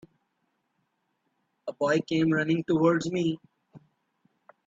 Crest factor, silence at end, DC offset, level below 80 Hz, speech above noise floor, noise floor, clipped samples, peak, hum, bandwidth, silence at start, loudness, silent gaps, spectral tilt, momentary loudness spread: 20 dB; 0.9 s; under 0.1%; -70 dBFS; 51 dB; -76 dBFS; under 0.1%; -10 dBFS; none; 7.8 kHz; 1.65 s; -26 LUFS; none; -6.5 dB/octave; 16 LU